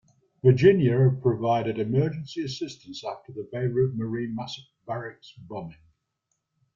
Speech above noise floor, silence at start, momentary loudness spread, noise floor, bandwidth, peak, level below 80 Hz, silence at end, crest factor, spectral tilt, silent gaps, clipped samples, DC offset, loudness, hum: 54 dB; 0.45 s; 19 LU; -79 dBFS; 7.4 kHz; -6 dBFS; -60 dBFS; 1 s; 20 dB; -8 dB/octave; none; under 0.1%; under 0.1%; -25 LUFS; none